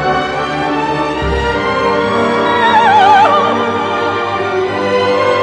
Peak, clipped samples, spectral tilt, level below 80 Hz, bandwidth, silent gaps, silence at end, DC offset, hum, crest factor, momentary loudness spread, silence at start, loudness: 0 dBFS; under 0.1%; -5 dB/octave; -32 dBFS; 10.5 kHz; none; 0 s; under 0.1%; none; 12 dB; 8 LU; 0 s; -12 LUFS